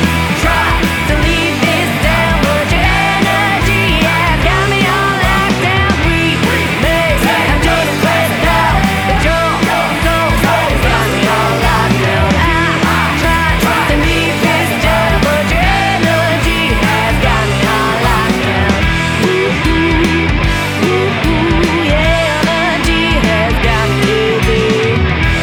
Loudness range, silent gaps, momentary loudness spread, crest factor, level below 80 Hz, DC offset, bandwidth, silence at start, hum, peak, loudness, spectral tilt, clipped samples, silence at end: 1 LU; none; 1 LU; 12 dB; -20 dBFS; under 0.1%; over 20 kHz; 0 s; none; 0 dBFS; -11 LUFS; -5 dB/octave; under 0.1%; 0 s